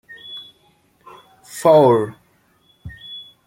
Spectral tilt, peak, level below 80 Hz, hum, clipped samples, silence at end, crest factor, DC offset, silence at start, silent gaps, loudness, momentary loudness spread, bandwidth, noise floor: -6 dB/octave; -2 dBFS; -56 dBFS; none; under 0.1%; 0.25 s; 18 dB; under 0.1%; 0.3 s; none; -15 LUFS; 24 LU; 16.5 kHz; -59 dBFS